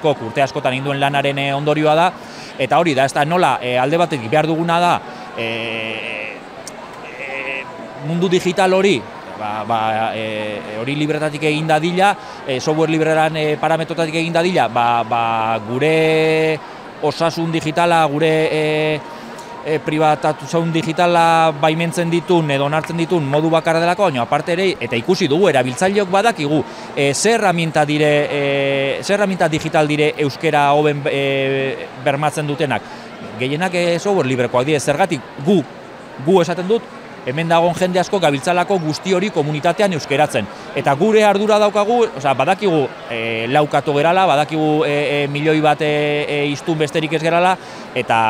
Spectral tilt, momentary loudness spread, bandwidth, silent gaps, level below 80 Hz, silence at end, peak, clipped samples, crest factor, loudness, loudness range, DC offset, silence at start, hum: -5 dB/octave; 10 LU; 16 kHz; none; -58 dBFS; 0 s; 0 dBFS; under 0.1%; 16 dB; -17 LUFS; 3 LU; under 0.1%; 0 s; none